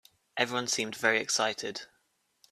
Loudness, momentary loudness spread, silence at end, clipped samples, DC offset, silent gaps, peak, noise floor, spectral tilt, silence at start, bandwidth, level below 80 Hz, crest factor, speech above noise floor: -29 LUFS; 13 LU; 0.65 s; under 0.1%; under 0.1%; none; -10 dBFS; -74 dBFS; -1.5 dB/octave; 0.35 s; 14.5 kHz; -76 dBFS; 24 dB; 43 dB